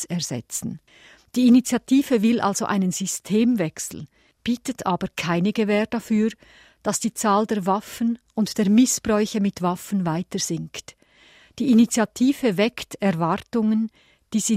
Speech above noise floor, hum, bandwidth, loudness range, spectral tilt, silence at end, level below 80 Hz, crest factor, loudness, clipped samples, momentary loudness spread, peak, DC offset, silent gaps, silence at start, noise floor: 32 dB; none; 16 kHz; 3 LU; -5 dB/octave; 0 s; -58 dBFS; 16 dB; -22 LUFS; under 0.1%; 12 LU; -6 dBFS; under 0.1%; none; 0 s; -53 dBFS